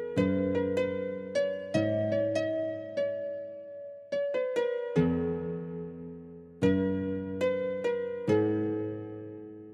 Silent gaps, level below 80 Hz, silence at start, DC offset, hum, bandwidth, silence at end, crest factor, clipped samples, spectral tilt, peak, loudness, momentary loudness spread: none; -62 dBFS; 0 s; under 0.1%; none; 10.5 kHz; 0 s; 18 dB; under 0.1%; -7.5 dB/octave; -12 dBFS; -31 LUFS; 15 LU